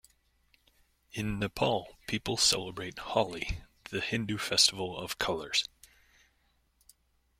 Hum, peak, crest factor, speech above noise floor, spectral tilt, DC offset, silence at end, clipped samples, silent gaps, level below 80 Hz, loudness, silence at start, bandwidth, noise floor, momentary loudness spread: none; -10 dBFS; 24 dB; 40 dB; -2.5 dB/octave; under 0.1%; 1.75 s; under 0.1%; none; -52 dBFS; -30 LUFS; 1.15 s; 16.5 kHz; -72 dBFS; 14 LU